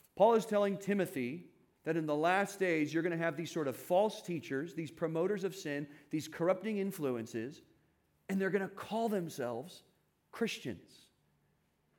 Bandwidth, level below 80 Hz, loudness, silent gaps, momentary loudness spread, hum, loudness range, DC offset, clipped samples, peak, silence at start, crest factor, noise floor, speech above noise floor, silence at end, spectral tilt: 18 kHz; -82 dBFS; -35 LUFS; none; 11 LU; none; 5 LU; under 0.1%; under 0.1%; -16 dBFS; 0.15 s; 20 dB; -76 dBFS; 41 dB; 1.2 s; -5.5 dB/octave